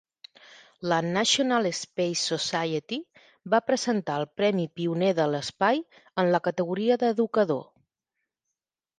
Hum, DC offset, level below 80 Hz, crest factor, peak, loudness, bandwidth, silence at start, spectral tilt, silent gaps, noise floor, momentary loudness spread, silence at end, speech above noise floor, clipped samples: none; under 0.1%; -72 dBFS; 18 dB; -8 dBFS; -26 LUFS; 10 kHz; 0.5 s; -4 dB/octave; none; -86 dBFS; 7 LU; 1.35 s; 60 dB; under 0.1%